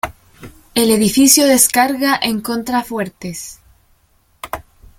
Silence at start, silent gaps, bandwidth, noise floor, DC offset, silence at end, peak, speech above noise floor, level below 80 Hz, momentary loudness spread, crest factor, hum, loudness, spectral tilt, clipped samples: 0.05 s; none; 17 kHz; -57 dBFS; under 0.1%; 0.4 s; 0 dBFS; 42 dB; -46 dBFS; 20 LU; 16 dB; none; -13 LUFS; -2.5 dB/octave; under 0.1%